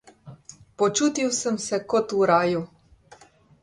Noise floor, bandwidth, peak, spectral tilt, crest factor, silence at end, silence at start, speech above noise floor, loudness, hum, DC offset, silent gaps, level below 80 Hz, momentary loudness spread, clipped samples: -53 dBFS; 11.5 kHz; -6 dBFS; -4 dB/octave; 18 dB; 0.95 s; 0.25 s; 30 dB; -23 LUFS; none; under 0.1%; none; -64 dBFS; 10 LU; under 0.1%